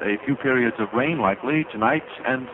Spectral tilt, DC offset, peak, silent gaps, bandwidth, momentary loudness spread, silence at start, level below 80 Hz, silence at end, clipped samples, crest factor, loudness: -9 dB/octave; under 0.1%; -4 dBFS; none; 4 kHz; 4 LU; 0 s; -58 dBFS; 0 s; under 0.1%; 18 dB; -22 LUFS